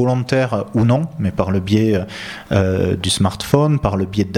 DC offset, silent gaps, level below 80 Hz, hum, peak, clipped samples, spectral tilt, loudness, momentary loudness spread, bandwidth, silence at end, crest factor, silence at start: under 0.1%; none; -40 dBFS; none; 0 dBFS; under 0.1%; -6 dB/octave; -17 LUFS; 5 LU; 16 kHz; 0 s; 16 dB; 0 s